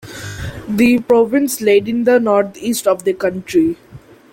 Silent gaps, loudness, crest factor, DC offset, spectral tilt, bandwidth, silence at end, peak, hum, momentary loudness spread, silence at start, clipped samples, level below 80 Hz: none; -15 LUFS; 14 dB; under 0.1%; -5 dB/octave; 17 kHz; 0.35 s; -2 dBFS; none; 14 LU; 0.05 s; under 0.1%; -46 dBFS